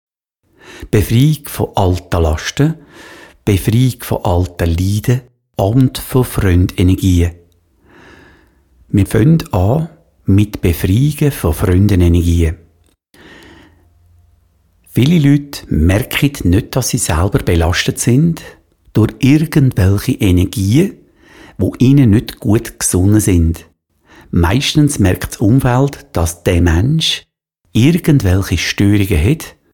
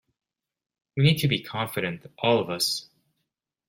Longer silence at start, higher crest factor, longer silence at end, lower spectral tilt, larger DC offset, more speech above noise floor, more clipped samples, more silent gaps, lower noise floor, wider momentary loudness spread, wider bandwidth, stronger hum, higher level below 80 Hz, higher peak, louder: second, 0.7 s vs 0.95 s; second, 12 dB vs 22 dB; second, 0.25 s vs 0.85 s; about the same, -6 dB/octave vs -5 dB/octave; first, 0.4% vs under 0.1%; second, 49 dB vs 57 dB; neither; neither; second, -60 dBFS vs -82 dBFS; about the same, 8 LU vs 10 LU; first, 18.5 kHz vs 16.5 kHz; neither; first, -28 dBFS vs -60 dBFS; first, 0 dBFS vs -6 dBFS; first, -13 LUFS vs -25 LUFS